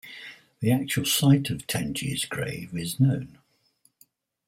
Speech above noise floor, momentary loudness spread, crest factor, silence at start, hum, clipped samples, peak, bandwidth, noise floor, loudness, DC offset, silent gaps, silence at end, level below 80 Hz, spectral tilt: 42 dB; 18 LU; 20 dB; 0.05 s; none; under 0.1%; -8 dBFS; 16.5 kHz; -67 dBFS; -25 LUFS; under 0.1%; none; 1.2 s; -58 dBFS; -5 dB/octave